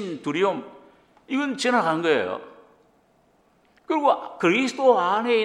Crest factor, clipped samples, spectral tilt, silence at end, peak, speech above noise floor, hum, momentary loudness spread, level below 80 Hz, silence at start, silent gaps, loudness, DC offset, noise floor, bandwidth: 18 dB; under 0.1%; -4.5 dB/octave; 0 s; -6 dBFS; 40 dB; none; 9 LU; -74 dBFS; 0 s; none; -23 LUFS; under 0.1%; -62 dBFS; 11.5 kHz